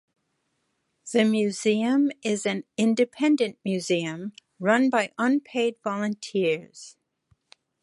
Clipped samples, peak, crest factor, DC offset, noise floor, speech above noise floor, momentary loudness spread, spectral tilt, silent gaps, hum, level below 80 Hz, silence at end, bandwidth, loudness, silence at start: under 0.1%; -6 dBFS; 20 dB; under 0.1%; -75 dBFS; 51 dB; 10 LU; -5 dB/octave; none; none; -76 dBFS; 0.95 s; 11.5 kHz; -25 LUFS; 1.05 s